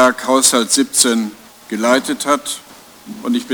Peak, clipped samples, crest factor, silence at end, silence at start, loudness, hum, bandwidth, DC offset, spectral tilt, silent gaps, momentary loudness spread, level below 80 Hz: 0 dBFS; under 0.1%; 16 dB; 0 s; 0 s; -14 LUFS; none; over 20 kHz; under 0.1%; -1.5 dB/octave; none; 15 LU; -58 dBFS